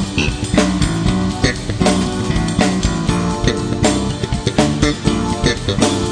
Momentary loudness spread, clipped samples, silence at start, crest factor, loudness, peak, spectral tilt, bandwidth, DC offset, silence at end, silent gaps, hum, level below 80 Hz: 3 LU; under 0.1%; 0 s; 16 dB; -17 LUFS; 0 dBFS; -5 dB/octave; 10.5 kHz; under 0.1%; 0 s; none; none; -26 dBFS